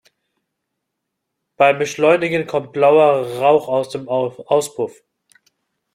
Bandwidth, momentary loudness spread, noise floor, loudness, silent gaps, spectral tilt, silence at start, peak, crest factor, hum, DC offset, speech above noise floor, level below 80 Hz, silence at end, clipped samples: 16 kHz; 9 LU; -78 dBFS; -17 LUFS; none; -5 dB/octave; 1.6 s; -2 dBFS; 18 dB; none; under 0.1%; 61 dB; -66 dBFS; 1.05 s; under 0.1%